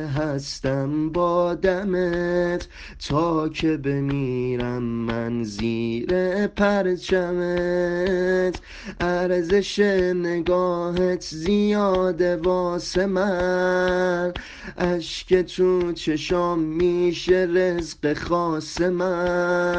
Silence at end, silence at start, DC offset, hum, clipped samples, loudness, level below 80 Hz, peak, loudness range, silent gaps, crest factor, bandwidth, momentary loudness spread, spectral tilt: 0 s; 0 s; under 0.1%; none; under 0.1%; -23 LUFS; -44 dBFS; -6 dBFS; 3 LU; none; 16 dB; 8.8 kHz; 6 LU; -6 dB/octave